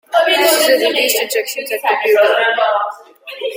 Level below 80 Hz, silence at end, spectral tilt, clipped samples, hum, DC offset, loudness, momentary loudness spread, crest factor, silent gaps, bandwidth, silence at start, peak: -68 dBFS; 0 s; 0.5 dB/octave; under 0.1%; none; under 0.1%; -13 LUFS; 13 LU; 14 dB; none; 16.5 kHz; 0.1 s; 0 dBFS